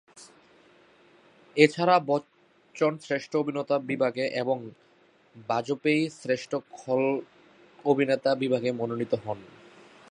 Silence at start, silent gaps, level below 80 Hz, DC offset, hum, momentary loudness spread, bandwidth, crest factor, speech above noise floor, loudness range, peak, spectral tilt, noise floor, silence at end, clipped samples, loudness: 0.15 s; none; -76 dBFS; under 0.1%; none; 12 LU; 10.5 kHz; 26 dB; 35 dB; 4 LU; -4 dBFS; -6 dB/octave; -61 dBFS; 0.65 s; under 0.1%; -27 LUFS